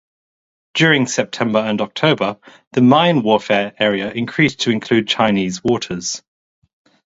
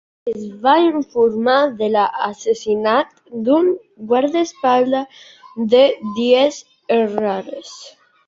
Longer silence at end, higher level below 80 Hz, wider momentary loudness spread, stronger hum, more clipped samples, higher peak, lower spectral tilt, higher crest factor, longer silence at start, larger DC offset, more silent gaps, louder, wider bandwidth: first, 0.85 s vs 0.4 s; first, -56 dBFS vs -64 dBFS; second, 10 LU vs 13 LU; neither; neither; about the same, 0 dBFS vs -2 dBFS; about the same, -4.5 dB/octave vs -4.5 dB/octave; about the same, 18 dB vs 16 dB; first, 0.75 s vs 0.25 s; neither; first, 2.67-2.71 s vs none; about the same, -16 LUFS vs -17 LUFS; about the same, 8 kHz vs 7.6 kHz